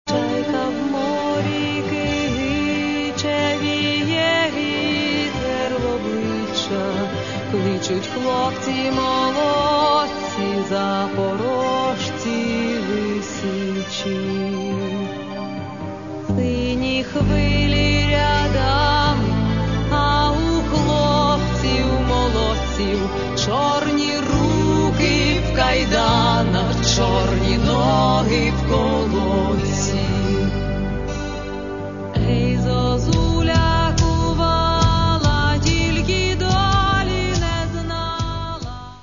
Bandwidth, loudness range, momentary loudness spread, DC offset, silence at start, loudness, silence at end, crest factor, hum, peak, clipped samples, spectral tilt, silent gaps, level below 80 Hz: 7.4 kHz; 5 LU; 7 LU; 0.4%; 0.05 s; -19 LUFS; 0 s; 16 dB; none; -2 dBFS; under 0.1%; -5.5 dB/octave; none; -28 dBFS